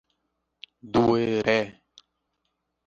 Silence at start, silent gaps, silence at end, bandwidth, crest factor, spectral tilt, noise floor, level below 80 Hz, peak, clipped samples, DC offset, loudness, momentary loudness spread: 0.85 s; none; 1.15 s; 7.6 kHz; 22 dB; -6.5 dB/octave; -78 dBFS; -58 dBFS; -6 dBFS; under 0.1%; under 0.1%; -24 LUFS; 5 LU